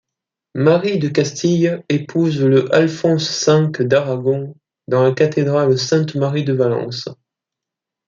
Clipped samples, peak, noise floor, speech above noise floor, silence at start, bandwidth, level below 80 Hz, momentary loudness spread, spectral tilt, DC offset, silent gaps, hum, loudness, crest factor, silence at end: under 0.1%; -2 dBFS; -84 dBFS; 68 dB; 0.55 s; 7.6 kHz; -60 dBFS; 7 LU; -6 dB/octave; under 0.1%; none; none; -16 LUFS; 14 dB; 0.95 s